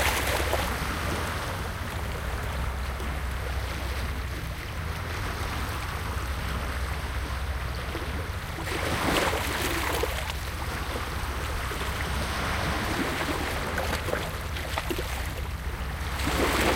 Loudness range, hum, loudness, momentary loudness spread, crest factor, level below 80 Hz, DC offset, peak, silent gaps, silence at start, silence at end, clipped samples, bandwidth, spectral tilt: 4 LU; none; -30 LUFS; 7 LU; 20 dB; -34 dBFS; under 0.1%; -10 dBFS; none; 0 s; 0 s; under 0.1%; 17 kHz; -4 dB/octave